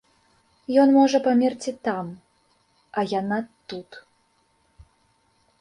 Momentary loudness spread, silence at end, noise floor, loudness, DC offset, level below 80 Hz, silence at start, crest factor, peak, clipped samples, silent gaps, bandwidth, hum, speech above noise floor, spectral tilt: 21 LU; 1.6 s; -66 dBFS; -22 LUFS; under 0.1%; -64 dBFS; 0.7 s; 18 dB; -6 dBFS; under 0.1%; none; 10.5 kHz; none; 44 dB; -5.5 dB/octave